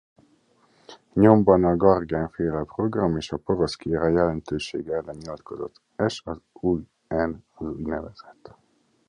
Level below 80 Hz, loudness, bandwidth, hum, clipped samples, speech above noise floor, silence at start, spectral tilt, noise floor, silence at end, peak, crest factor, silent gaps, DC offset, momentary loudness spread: -46 dBFS; -24 LUFS; 10 kHz; none; under 0.1%; 39 dB; 0.9 s; -7.5 dB/octave; -62 dBFS; 1 s; -2 dBFS; 24 dB; none; under 0.1%; 18 LU